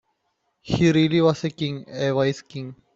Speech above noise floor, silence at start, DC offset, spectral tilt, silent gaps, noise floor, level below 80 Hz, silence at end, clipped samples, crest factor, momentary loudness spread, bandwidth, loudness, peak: 51 dB; 0.65 s; under 0.1%; -6.5 dB/octave; none; -73 dBFS; -52 dBFS; 0.2 s; under 0.1%; 18 dB; 14 LU; 7.8 kHz; -22 LUFS; -6 dBFS